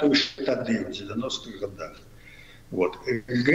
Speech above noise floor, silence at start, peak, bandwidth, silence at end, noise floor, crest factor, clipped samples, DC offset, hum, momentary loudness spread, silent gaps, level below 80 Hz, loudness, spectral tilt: 22 dB; 0 s; -6 dBFS; 11.5 kHz; 0 s; -48 dBFS; 20 dB; under 0.1%; under 0.1%; none; 24 LU; none; -54 dBFS; -28 LUFS; -5 dB/octave